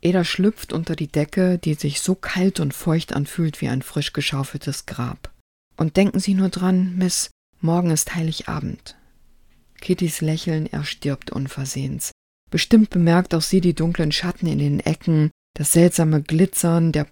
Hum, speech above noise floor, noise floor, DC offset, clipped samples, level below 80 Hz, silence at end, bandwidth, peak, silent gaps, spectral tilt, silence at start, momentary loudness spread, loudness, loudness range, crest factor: none; 33 dB; -53 dBFS; under 0.1%; under 0.1%; -44 dBFS; 0.05 s; 18 kHz; -2 dBFS; 5.41-5.71 s, 7.31-7.53 s, 12.12-12.47 s, 15.31-15.54 s; -5.5 dB/octave; 0.05 s; 11 LU; -21 LUFS; 6 LU; 20 dB